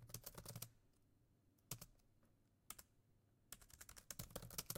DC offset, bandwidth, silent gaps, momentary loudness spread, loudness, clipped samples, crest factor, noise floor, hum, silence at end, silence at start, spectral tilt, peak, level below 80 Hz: under 0.1%; 16.5 kHz; none; 9 LU; -56 LUFS; under 0.1%; 30 dB; -77 dBFS; none; 0 s; 0 s; -2.5 dB/octave; -28 dBFS; -72 dBFS